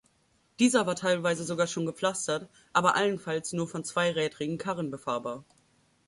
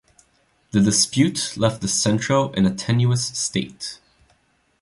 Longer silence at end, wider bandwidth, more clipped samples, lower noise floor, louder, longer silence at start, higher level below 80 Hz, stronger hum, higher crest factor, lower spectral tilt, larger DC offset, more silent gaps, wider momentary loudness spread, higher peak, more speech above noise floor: second, 0.65 s vs 0.85 s; about the same, 11.5 kHz vs 11.5 kHz; neither; first, -69 dBFS vs -63 dBFS; second, -29 LUFS vs -20 LUFS; second, 0.6 s vs 0.75 s; second, -70 dBFS vs -50 dBFS; neither; about the same, 22 dB vs 18 dB; about the same, -4 dB/octave vs -4.5 dB/octave; neither; neither; about the same, 9 LU vs 9 LU; second, -8 dBFS vs -4 dBFS; about the same, 40 dB vs 43 dB